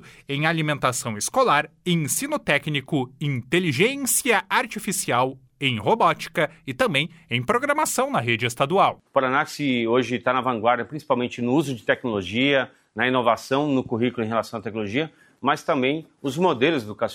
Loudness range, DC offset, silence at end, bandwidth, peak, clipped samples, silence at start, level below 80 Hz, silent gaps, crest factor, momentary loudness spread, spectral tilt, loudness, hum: 2 LU; under 0.1%; 0 s; 18 kHz; -4 dBFS; under 0.1%; 0.05 s; -60 dBFS; none; 18 dB; 7 LU; -4 dB/octave; -23 LUFS; none